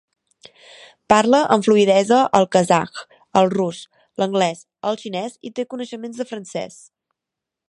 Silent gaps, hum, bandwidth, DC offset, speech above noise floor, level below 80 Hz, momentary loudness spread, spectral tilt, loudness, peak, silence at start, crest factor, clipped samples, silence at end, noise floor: none; none; 11.5 kHz; under 0.1%; 66 dB; -62 dBFS; 16 LU; -5 dB/octave; -19 LUFS; 0 dBFS; 1.1 s; 20 dB; under 0.1%; 1.05 s; -85 dBFS